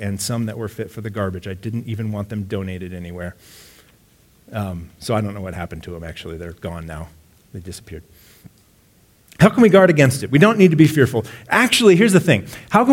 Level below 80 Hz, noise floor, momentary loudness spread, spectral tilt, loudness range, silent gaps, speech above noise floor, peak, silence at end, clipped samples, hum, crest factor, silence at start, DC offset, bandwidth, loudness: -46 dBFS; -54 dBFS; 21 LU; -5.5 dB/octave; 19 LU; none; 37 dB; 0 dBFS; 0 s; under 0.1%; none; 18 dB; 0 s; under 0.1%; 17 kHz; -17 LUFS